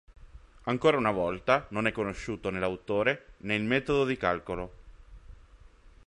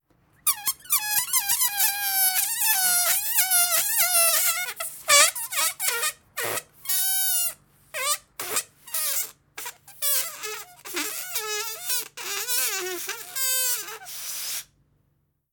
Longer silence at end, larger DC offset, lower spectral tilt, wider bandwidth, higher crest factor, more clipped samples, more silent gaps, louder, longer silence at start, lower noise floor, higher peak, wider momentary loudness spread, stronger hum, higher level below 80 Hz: second, 0.4 s vs 0.9 s; neither; first, -6 dB/octave vs 2 dB/octave; second, 11 kHz vs over 20 kHz; about the same, 22 dB vs 22 dB; neither; neither; second, -29 LUFS vs -22 LUFS; second, 0.1 s vs 0.45 s; second, -54 dBFS vs -70 dBFS; second, -8 dBFS vs -4 dBFS; second, 10 LU vs 13 LU; neither; first, -52 dBFS vs -68 dBFS